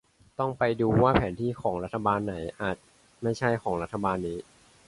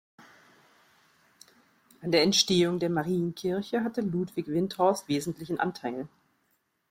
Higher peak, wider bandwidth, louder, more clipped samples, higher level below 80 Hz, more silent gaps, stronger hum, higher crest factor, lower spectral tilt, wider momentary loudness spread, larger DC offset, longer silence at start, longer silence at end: about the same, -6 dBFS vs -8 dBFS; second, 11.5 kHz vs 16 kHz; about the same, -28 LUFS vs -28 LUFS; neither; first, -48 dBFS vs -66 dBFS; neither; neither; about the same, 22 dB vs 22 dB; first, -7.5 dB/octave vs -4.5 dB/octave; about the same, 11 LU vs 13 LU; neither; second, 0.4 s vs 2 s; second, 0.45 s vs 0.85 s